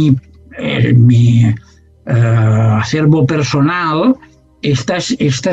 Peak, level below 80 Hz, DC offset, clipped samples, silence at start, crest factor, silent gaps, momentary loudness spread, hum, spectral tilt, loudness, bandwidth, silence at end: 0 dBFS; -44 dBFS; under 0.1%; under 0.1%; 0 s; 12 dB; none; 10 LU; none; -7 dB/octave; -12 LUFS; 8 kHz; 0 s